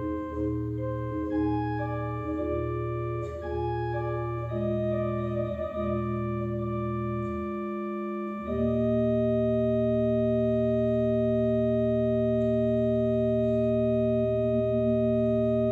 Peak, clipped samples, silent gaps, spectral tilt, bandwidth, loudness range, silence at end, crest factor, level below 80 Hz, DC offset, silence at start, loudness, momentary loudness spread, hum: -14 dBFS; under 0.1%; none; -10.5 dB/octave; 4.8 kHz; 5 LU; 0 s; 12 dB; -44 dBFS; under 0.1%; 0 s; -28 LUFS; 7 LU; none